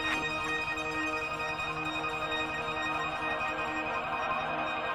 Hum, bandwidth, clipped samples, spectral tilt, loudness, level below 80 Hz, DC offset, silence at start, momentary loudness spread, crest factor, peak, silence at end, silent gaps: none; 18 kHz; under 0.1%; -3.5 dB/octave; -32 LUFS; -54 dBFS; under 0.1%; 0 s; 2 LU; 16 dB; -18 dBFS; 0 s; none